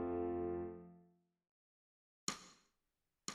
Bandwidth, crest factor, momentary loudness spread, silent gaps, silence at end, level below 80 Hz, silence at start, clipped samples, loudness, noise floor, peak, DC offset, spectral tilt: 14 kHz; 24 dB; 19 LU; 1.49-2.27 s; 0 s; -70 dBFS; 0 s; under 0.1%; -44 LUFS; -89 dBFS; -22 dBFS; under 0.1%; -4 dB/octave